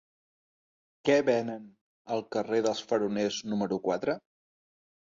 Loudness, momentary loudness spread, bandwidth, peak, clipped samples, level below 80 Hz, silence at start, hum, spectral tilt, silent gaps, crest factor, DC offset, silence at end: -30 LUFS; 10 LU; 7.8 kHz; -12 dBFS; under 0.1%; -72 dBFS; 1.05 s; none; -5 dB/octave; 1.81-2.05 s; 20 dB; under 0.1%; 0.95 s